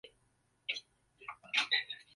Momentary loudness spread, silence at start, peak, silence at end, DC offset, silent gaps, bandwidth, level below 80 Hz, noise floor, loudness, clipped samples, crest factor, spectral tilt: 19 LU; 0.05 s; -16 dBFS; 0.15 s; under 0.1%; none; 11.5 kHz; -82 dBFS; -75 dBFS; -35 LUFS; under 0.1%; 24 dB; 1.5 dB/octave